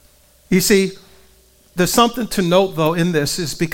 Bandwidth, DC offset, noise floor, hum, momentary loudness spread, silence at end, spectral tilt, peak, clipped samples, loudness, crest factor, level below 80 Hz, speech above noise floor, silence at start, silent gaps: 17.5 kHz; under 0.1%; -52 dBFS; none; 7 LU; 0 s; -4.5 dB/octave; 0 dBFS; under 0.1%; -17 LUFS; 18 dB; -42 dBFS; 35 dB; 0.5 s; none